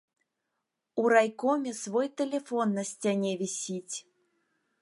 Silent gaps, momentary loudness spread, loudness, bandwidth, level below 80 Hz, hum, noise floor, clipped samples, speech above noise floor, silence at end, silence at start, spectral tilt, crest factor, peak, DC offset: none; 12 LU; -29 LUFS; 11.5 kHz; -86 dBFS; none; -84 dBFS; under 0.1%; 55 dB; 0.8 s; 0.95 s; -4.5 dB/octave; 22 dB; -10 dBFS; under 0.1%